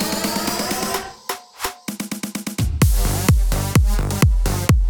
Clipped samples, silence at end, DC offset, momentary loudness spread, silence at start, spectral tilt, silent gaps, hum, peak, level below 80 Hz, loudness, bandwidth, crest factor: under 0.1%; 0 s; under 0.1%; 10 LU; 0 s; -4.5 dB/octave; none; none; -6 dBFS; -22 dBFS; -21 LUFS; over 20 kHz; 14 dB